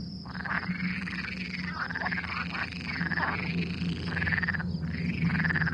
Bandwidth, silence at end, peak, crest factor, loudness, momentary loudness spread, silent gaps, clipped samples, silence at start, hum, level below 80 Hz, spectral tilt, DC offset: 8.8 kHz; 0 s; -14 dBFS; 18 dB; -31 LUFS; 6 LU; none; under 0.1%; 0 s; none; -52 dBFS; -6.5 dB/octave; under 0.1%